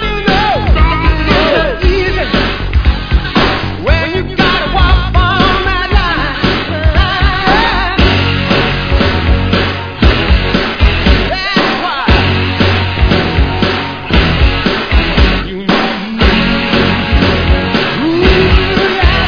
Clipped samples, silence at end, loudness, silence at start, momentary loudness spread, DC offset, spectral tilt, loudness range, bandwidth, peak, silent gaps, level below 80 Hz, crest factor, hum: 0.5%; 0 s; -11 LUFS; 0 s; 4 LU; under 0.1%; -6.5 dB/octave; 1 LU; 5.4 kHz; 0 dBFS; none; -14 dBFS; 10 dB; none